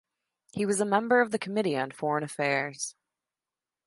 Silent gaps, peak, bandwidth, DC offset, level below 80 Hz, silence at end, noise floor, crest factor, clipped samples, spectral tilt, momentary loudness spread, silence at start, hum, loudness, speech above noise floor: none; -10 dBFS; 11.5 kHz; under 0.1%; -76 dBFS; 0.95 s; under -90 dBFS; 20 dB; under 0.1%; -4.5 dB/octave; 11 LU; 0.55 s; none; -28 LUFS; over 62 dB